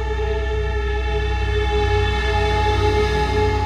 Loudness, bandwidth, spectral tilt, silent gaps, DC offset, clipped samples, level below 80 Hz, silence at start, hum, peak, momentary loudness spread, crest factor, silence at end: -20 LUFS; 9.6 kHz; -6 dB/octave; none; under 0.1%; under 0.1%; -22 dBFS; 0 s; none; -6 dBFS; 5 LU; 12 dB; 0 s